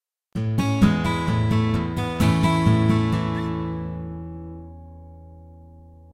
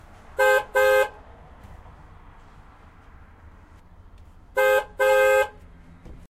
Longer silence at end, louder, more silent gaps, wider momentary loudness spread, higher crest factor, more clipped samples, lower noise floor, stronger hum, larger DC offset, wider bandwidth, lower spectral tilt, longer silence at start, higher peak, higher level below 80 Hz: first, 0.3 s vs 0.15 s; about the same, -22 LUFS vs -21 LUFS; neither; first, 19 LU vs 11 LU; about the same, 18 dB vs 18 dB; neither; about the same, -46 dBFS vs -49 dBFS; neither; neither; second, 14 kHz vs 15.5 kHz; first, -7 dB/octave vs -2.5 dB/octave; about the same, 0.35 s vs 0.4 s; first, -4 dBFS vs -8 dBFS; first, -40 dBFS vs -48 dBFS